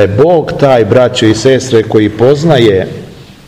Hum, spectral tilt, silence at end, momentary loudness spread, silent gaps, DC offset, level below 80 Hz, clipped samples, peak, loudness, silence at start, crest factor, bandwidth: none; -6 dB/octave; 0.25 s; 4 LU; none; under 0.1%; -38 dBFS; 4%; 0 dBFS; -8 LUFS; 0 s; 8 dB; 12.5 kHz